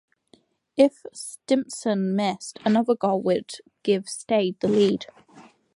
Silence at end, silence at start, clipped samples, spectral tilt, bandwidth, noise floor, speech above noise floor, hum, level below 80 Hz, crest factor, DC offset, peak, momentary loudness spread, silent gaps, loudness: 0.35 s; 0.75 s; under 0.1%; -5.5 dB/octave; 11.5 kHz; -60 dBFS; 37 dB; none; -68 dBFS; 20 dB; under 0.1%; -4 dBFS; 14 LU; none; -24 LUFS